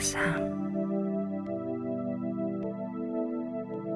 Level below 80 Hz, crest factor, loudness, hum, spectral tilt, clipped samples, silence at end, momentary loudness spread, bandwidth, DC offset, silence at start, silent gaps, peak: -60 dBFS; 16 dB; -33 LUFS; 50 Hz at -60 dBFS; -5 dB/octave; under 0.1%; 0 s; 6 LU; 13 kHz; under 0.1%; 0 s; none; -16 dBFS